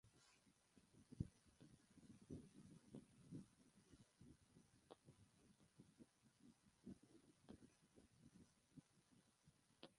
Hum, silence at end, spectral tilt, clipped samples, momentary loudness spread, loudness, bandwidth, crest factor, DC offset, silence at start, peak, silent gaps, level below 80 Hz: none; 0 s; -6.5 dB/octave; under 0.1%; 13 LU; -62 LUFS; 11 kHz; 32 dB; under 0.1%; 0.05 s; -34 dBFS; none; -78 dBFS